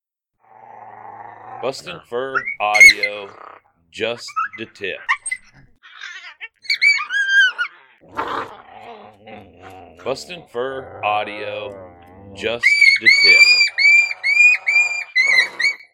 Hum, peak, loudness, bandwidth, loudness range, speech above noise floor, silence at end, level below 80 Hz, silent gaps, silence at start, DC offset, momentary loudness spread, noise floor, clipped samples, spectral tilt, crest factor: none; 0 dBFS; -13 LUFS; 18.5 kHz; 16 LU; 44 dB; 0.2 s; -58 dBFS; none; 0.75 s; under 0.1%; 23 LU; -61 dBFS; under 0.1%; 0 dB/octave; 18 dB